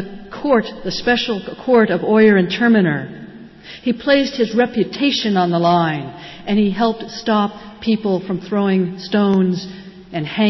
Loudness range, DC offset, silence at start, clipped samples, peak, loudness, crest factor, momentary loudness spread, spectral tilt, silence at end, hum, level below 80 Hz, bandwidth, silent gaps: 3 LU; under 0.1%; 0 s; under 0.1%; -4 dBFS; -17 LUFS; 14 dB; 13 LU; -6.5 dB/octave; 0 s; none; -52 dBFS; 6.2 kHz; none